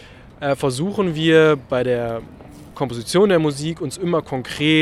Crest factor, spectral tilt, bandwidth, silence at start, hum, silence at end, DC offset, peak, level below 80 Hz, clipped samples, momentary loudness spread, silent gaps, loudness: 18 dB; -5.5 dB/octave; 13.5 kHz; 0.05 s; none; 0 s; under 0.1%; -2 dBFS; -48 dBFS; under 0.1%; 13 LU; none; -19 LUFS